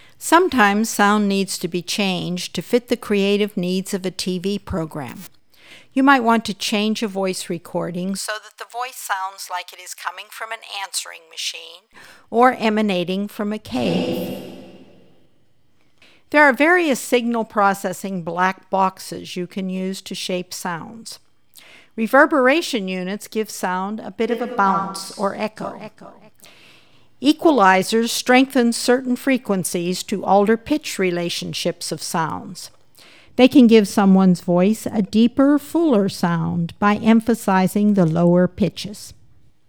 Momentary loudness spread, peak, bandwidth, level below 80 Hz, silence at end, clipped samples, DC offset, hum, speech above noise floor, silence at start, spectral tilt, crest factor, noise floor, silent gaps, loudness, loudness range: 15 LU; 0 dBFS; over 20 kHz; -56 dBFS; 0.55 s; under 0.1%; 0.3%; none; 44 dB; 0.2 s; -5 dB/octave; 20 dB; -63 dBFS; none; -19 LUFS; 9 LU